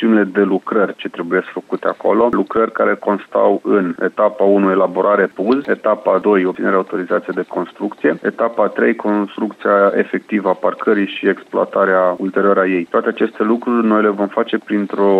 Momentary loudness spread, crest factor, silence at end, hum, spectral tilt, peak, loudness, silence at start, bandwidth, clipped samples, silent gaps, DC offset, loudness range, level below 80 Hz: 6 LU; 14 dB; 0 s; none; -8 dB/octave; -2 dBFS; -16 LUFS; 0 s; 5.8 kHz; under 0.1%; none; under 0.1%; 2 LU; -62 dBFS